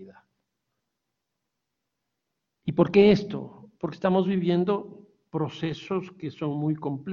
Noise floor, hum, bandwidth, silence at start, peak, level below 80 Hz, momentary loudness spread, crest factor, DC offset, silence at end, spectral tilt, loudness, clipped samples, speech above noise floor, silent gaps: -83 dBFS; none; 7 kHz; 0 s; -6 dBFS; -62 dBFS; 17 LU; 22 dB; under 0.1%; 0 s; -8.5 dB/octave; -26 LUFS; under 0.1%; 58 dB; none